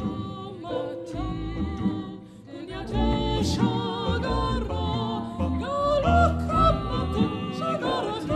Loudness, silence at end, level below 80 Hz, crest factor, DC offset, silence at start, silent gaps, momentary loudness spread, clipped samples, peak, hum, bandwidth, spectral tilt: -26 LUFS; 0 s; -34 dBFS; 18 dB; under 0.1%; 0 s; none; 13 LU; under 0.1%; -8 dBFS; none; 12 kHz; -7 dB/octave